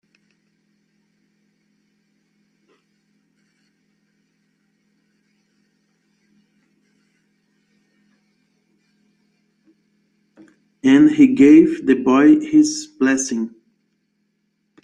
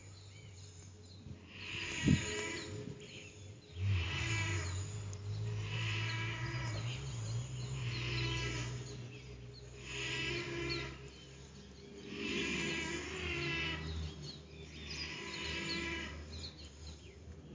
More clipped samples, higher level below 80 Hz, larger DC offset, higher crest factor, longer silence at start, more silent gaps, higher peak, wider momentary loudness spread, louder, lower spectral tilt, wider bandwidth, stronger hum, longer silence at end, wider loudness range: neither; second, -64 dBFS vs -52 dBFS; neither; second, 18 dB vs 26 dB; first, 10.85 s vs 0 s; neither; first, -2 dBFS vs -16 dBFS; second, 12 LU vs 17 LU; first, -14 LUFS vs -39 LUFS; about the same, -5 dB/octave vs -4.5 dB/octave; first, 10 kHz vs 7.6 kHz; neither; first, 1.35 s vs 0 s; about the same, 6 LU vs 4 LU